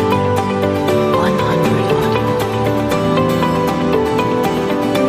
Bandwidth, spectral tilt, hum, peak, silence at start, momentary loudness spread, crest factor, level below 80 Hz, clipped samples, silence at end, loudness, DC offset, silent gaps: 15.5 kHz; -6.5 dB/octave; none; -2 dBFS; 0 s; 2 LU; 14 dB; -38 dBFS; under 0.1%; 0 s; -15 LUFS; under 0.1%; none